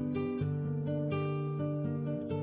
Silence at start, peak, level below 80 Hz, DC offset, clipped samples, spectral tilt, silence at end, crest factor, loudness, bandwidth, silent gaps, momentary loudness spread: 0 s; -24 dBFS; -58 dBFS; under 0.1%; under 0.1%; -9 dB/octave; 0 s; 10 dB; -35 LUFS; 4 kHz; none; 1 LU